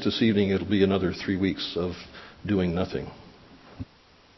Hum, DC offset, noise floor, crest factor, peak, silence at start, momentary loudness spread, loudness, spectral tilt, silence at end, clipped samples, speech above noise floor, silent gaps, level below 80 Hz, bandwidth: none; under 0.1%; -56 dBFS; 18 dB; -8 dBFS; 0 s; 20 LU; -26 LUFS; -7 dB/octave; 0.55 s; under 0.1%; 31 dB; none; -46 dBFS; 6 kHz